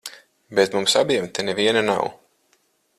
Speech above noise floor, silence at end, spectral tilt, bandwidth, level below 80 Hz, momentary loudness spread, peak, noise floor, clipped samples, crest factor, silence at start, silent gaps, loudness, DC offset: 44 dB; 0.85 s; -3 dB/octave; 14.5 kHz; -64 dBFS; 8 LU; -4 dBFS; -65 dBFS; under 0.1%; 20 dB; 0.05 s; none; -20 LUFS; under 0.1%